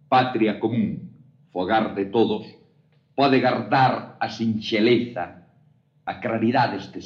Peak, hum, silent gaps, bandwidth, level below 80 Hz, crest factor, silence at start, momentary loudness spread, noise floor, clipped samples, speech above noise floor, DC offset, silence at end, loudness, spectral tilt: -6 dBFS; none; none; 7 kHz; -68 dBFS; 18 dB; 0.1 s; 14 LU; -60 dBFS; under 0.1%; 38 dB; under 0.1%; 0 s; -22 LUFS; -7 dB/octave